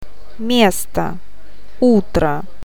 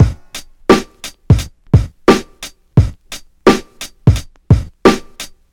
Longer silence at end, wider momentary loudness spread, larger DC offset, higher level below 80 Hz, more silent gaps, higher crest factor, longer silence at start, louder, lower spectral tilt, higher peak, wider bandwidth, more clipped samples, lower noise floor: about the same, 0.2 s vs 0.25 s; second, 13 LU vs 18 LU; first, 9% vs 0.2%; second, -36 dBFS vs -24 dBFS; neither; about the same, 18 dB vs 14 dB; first, 0.4 s vs 0 s; second, -17 LUFS vs -14 LUFS; second, -5 dB/octave vs -6.5 dB/octave; about the same, 0 dBFS vs 0 dBFS; about the same, 18.5 kHz vs 18 kHz; neither; first, -44 dBFS vs -35 dBFS